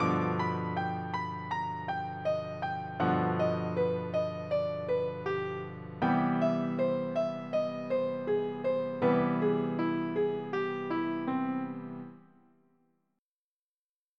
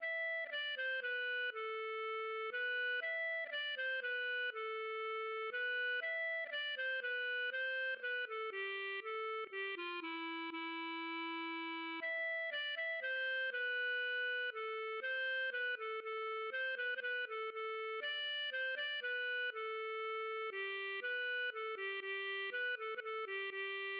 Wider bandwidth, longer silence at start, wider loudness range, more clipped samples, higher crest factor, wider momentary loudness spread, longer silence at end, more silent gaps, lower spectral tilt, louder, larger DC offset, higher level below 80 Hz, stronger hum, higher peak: first, 6.6 kHz vs 5.4 kHz; about the same, 0 s vs 0 s; about the same, 4 LU vs 2 LU; neither; first, 16 dB vs 10 dB; first, 7 LU vs 4 LU; first, 2 s vs 0 s; neither; first, -8.5 dB/octave vs 5 dB/octave; first, -32 LUFS vs -40 LUFS; neither; first, -72 dBFS vs under -90 dBFS; neither; first, -16 dBFS vs -32 dBFS